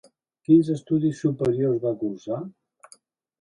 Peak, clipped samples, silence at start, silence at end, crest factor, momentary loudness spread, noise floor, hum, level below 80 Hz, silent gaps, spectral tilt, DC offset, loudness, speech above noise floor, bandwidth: -6 dBFS; under 0.1%; 0.5 s; 0.9 s; 18 dB; 13 LU; -57 dBFS; none; -64 dBFS; none; -9 dB/octave; under 0.1%; -23 LUFS; 34 dB; 10.5 kHz